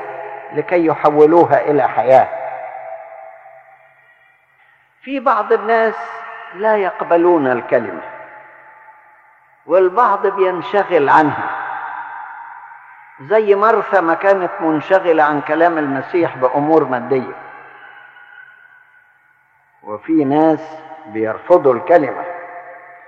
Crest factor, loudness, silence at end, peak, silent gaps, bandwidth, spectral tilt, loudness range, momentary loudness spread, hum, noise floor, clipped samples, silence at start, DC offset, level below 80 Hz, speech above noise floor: 16 dB; -15 LUFS; 0.1 s; 0 dBFS; none; 7.2 kHz; -8 dB/octave; 6 LU; 20 LU; none; -55 dBFS; under 0.1%; 0 s; under 0.1%; -70 dBFS; 41 dB